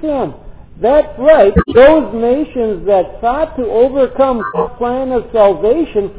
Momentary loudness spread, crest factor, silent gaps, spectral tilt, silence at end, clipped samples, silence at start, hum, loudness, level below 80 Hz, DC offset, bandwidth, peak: 10 LU; 12 dB; none; -10.5 dB/octave; 0 s; 0.2%; 0 s; none; -12 LUFS; -32 dBFS; 1%; 4 kHz; 0 dBFS